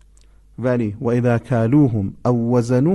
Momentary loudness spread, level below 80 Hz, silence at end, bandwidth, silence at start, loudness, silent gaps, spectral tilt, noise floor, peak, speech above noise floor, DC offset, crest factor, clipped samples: 6 LU; -46 dBFS; 0 s; 11 kHz; 0.6 s; -18 LUFS; none; -9 dB/octave; -49 dBFS; -4 dBFS; 32 dB; under 0.1%; 14 dB; under 0.1%